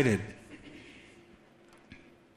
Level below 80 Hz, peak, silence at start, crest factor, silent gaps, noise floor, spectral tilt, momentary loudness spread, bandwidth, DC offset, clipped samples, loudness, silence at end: -64 dBFS; -12 dBFS; 0 s; 24 dB; none; -59 dBFS; -6.5 dB/octave; 25 LU; 14 kHz; under 0.1%; under 0.1%; -36 LUFS; 0.4 s